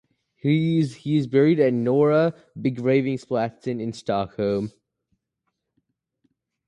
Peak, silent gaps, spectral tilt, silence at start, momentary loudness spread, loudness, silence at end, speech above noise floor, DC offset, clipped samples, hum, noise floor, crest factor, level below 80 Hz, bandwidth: -6 dBFS; none; -8 dB/octave; 0.45 s; 10 LU; -23 LUFS; 2 s; 57 dB; under 0.1%; under 0.1%; none; -79 dBFS; 16 dB; -62 dBFS; 10.5 kHz